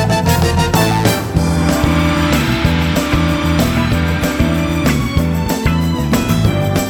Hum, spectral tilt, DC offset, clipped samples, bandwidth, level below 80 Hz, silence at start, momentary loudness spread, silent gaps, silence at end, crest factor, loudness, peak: none; -5.5 dB/octave; under 0.1%; under 0.1%; over 20 kHz; -24 dBFS; 0 s; 3 LU; none; 0 s; 14 dB; -14 LUFS; 0 dBFS